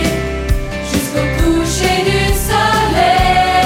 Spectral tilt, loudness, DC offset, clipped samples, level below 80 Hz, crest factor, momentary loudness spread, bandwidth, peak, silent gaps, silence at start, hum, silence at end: -4.5 dB/octave; -14 LUFS; under 0.1%; under 0.1%; -22 dBFS; 12 dB; 8 LU; 16.5 kHz; 0 dBFS; none; 0 s; none; 0 s